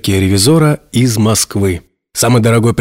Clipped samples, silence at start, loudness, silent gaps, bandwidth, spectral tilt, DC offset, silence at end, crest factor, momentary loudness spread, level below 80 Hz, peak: under 0.1%; 0.05 s; -11 LUFS; none; 16.5 kHz; -5 dB/octave; under 0.1%; 0 s; 10 dB; 7 LU; -40 dBFS; 0 dBFS